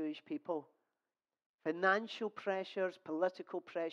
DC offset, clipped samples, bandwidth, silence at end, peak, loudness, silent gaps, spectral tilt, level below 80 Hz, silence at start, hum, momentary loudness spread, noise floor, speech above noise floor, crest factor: under 0.1%; under 0.1%; 7.8 kHz; 0 s; -18 dBFS; -39 LUFS; 1.46-1.58 s; -5.5 dB/octave; under -90 dBFS; 0 s; none; 11 LU; under -90 dBFS; over 51 dB; 20 dB